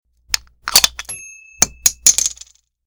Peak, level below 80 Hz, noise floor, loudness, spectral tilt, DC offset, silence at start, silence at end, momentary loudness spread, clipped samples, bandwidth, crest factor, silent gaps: 0 dBFS; -44 dBFS; -44 dBFS; -14 LUFS; 1.5 dB/octave; under 0.1%; 0.3 s; 0.55 s; 17 LU; under 0.1%; over 20 kHz; 20 dB; none